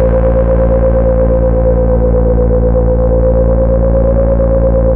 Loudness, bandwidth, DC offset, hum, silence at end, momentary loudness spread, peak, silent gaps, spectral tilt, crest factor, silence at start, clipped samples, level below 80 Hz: -11 LUFS; 2.5 kHz; 2%; none; 0 s; 1 LU; -2 dBFS; none; -13.5 dB/octave; 8 dB; 0 s; under 0.1%; -12 dBFS